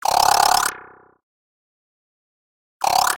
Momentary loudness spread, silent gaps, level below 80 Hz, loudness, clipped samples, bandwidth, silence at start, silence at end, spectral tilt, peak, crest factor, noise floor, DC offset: 10 LU; 1.23-2.80 s; -54 dBFS; -17 LUFS; under 0.1%; 17.5 kHz; 0.05 s; 0 s; 0 dB/octave; -2 dBFS; 20 dB; -43 dBFS; under 0.1%